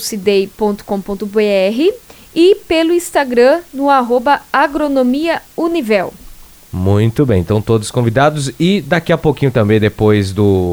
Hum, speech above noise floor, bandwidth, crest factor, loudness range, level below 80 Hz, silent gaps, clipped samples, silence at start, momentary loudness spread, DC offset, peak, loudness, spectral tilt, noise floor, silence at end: none; 23 dB; over 20 kHz; 14 dB; 2 LU; -40 dBFS; none; under 0.1%; 0 s; 7 LU; under 0.1%; 0 dBFS; -13 LUFS; -6 dB/octave; -36 dBFS; 0 s